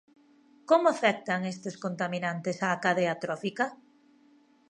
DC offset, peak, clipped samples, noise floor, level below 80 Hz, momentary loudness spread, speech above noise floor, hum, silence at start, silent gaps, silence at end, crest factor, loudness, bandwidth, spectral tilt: under 0.1%; -10 dBFS; under 0.1%; -62 dBFS; -80 dBFS; 9 LU; 33 dB; none; 0.7 s; none; 0.95 s; 22 dB; -29 LUFS; 10.5 kHz; -5 dB/octave